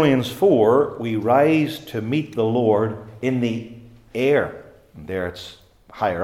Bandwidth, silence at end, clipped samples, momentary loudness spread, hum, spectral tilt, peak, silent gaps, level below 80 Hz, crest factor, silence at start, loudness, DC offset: 15.5 kHz; 0 s; under 0.1%; 15 LU; none; -7 dB/octave; -4 dBFS; none; -56 dBFS; 16 dB; 0 s; -21 LUFS; under 0.1%